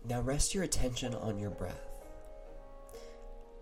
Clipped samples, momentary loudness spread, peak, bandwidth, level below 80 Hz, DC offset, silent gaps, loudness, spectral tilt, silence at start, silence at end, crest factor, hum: under 0.1%; 21 LU; -16 dBFS; 16 kHz; -44 dBFS; under 0.1%; none; -36 LUFS; -4 dB/octave; 0 s; 0 s; 20 dB; none